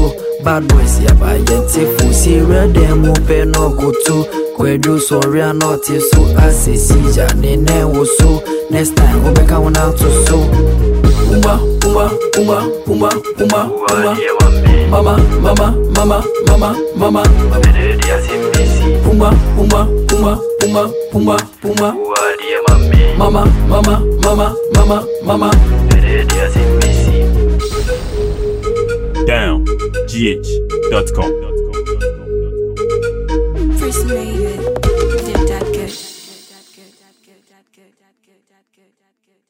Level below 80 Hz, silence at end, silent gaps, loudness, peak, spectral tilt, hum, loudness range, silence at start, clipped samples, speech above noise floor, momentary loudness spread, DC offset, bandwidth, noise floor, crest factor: -14 dBFS; 3.15 s; none; -12 LUFS; 0 dBFS; -5.5 dB/octave; none; 6 LU; 0 s; under 0.1%; 55 dB; 8 LU; under 0.1%; 16.5 kHz; -65 dBFS; 10 dB